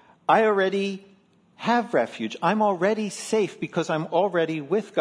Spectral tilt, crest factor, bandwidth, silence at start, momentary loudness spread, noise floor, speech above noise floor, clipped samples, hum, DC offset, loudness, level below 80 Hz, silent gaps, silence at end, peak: -5 dB/octave; 18 dB; 11 kHz; 0.3 s; 8 LU; -58 dBFS; 34 dB; under 0.1%; none; under 0.1%; -24 LUFS; -76 dBFS; none; 0 s; -6 dBFS